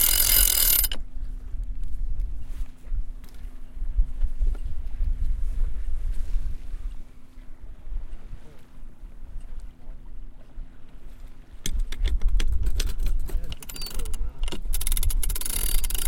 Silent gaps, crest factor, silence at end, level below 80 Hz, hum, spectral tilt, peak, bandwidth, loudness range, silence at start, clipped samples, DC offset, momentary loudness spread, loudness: none; 18 dB; 0 s; -28 dBFS; none; -1.5 dB/octave; -6 dBFS; 17.5 kHz; 17 LU; 0 s; under 0.1%; under 0.1%; 24 LU; -27 LUFS